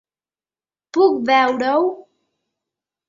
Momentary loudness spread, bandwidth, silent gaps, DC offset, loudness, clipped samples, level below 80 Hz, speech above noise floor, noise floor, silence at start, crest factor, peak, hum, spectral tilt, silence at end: 9 LU; 7.6 kHz; none; under 0.1%; -17 LUFS; under 0.1%; -70 dBFS; over 74 dB; under -90 dBFS; 0.95 s; 18 dB; -2 dBFS; none; -4.5 dB/octave; 1.05 s